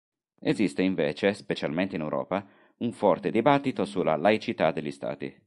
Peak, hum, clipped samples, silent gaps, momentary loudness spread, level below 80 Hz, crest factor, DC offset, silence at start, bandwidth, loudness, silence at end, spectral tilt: -6 dBFS; none; under 0.1%; none; 10 LU; -62 dBFS; 22 dB; under 0.1%; 0.45 s; 11.5 kHz; -27 LUFS; 0.15 s; -6.5 dB/octave